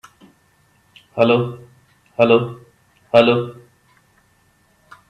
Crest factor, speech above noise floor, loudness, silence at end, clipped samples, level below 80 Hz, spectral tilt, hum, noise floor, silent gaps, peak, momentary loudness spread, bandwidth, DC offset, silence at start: 20 dB; 43 dB; -17 LUFS; 1.55 s; under 0.1%; -62 dBFS; -7.5 dB/octave; none; -58 dBFS; none; 0 dBFS; 18 LU; 9.6 kHz; under 0.1%; 1.15 s